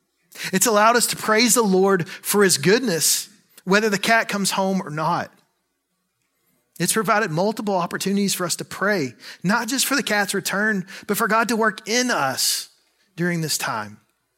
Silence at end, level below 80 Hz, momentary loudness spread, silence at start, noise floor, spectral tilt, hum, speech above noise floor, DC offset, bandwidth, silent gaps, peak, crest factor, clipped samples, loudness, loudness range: 0.45 s; -70 dBFS; 11 LU; 0.35 s; -73 dBFS; -3 dB/octave; none; 53 dB; under 0.1%; 16.5 kHz; none; 0 dBFS; 22 dB; under 0.1%; -20 LUFS; 6 LU